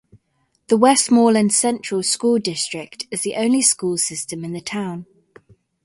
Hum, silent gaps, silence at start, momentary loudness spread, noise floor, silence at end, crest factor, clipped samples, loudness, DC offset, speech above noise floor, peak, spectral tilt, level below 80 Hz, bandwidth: none; none; 0.7 s; 14 LU; -67 dBFS; 0.8 s; 18 dB; under 0.1%; -18 LUFS; under 0.1%; 49 dB; 0 dBFS; -3 dB/octave; -64 dBFS; 11.5 kHz